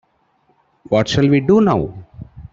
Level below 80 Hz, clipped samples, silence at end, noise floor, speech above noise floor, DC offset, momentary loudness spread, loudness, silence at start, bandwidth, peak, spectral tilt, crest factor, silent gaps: -44 dBFS; under 0.1%; 0.05 s; -60 dBFS; 46 dB; under 0.1%; 20 LU; -15 LUFS; 0.9 s; 7.8 kHz; -2 dBFS; -7 dB/octave; 14 dB; none